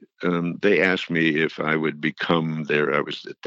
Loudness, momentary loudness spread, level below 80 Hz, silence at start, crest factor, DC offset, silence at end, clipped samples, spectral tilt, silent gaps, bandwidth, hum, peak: -22 LUFS; 6 LU; -66 dBFS; 0.2 s; 20 dB; under 0.1%; 0 s; under 0.1%; -6.5 dB/octave; none; 7.8 kHz; none; -4 dBFS